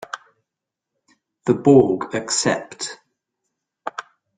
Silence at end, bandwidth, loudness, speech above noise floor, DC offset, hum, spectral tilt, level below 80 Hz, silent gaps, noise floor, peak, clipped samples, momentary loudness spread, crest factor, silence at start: 0.35 s; 9.6 kHz; -19 LUFS; 66 dB; under 0.1%; none; -4.5 dB/octave; -58 dBFS; none; -84 dBFS; -2 dBFS; under 0.1%; 21 LU; 20 dB; 0.15 s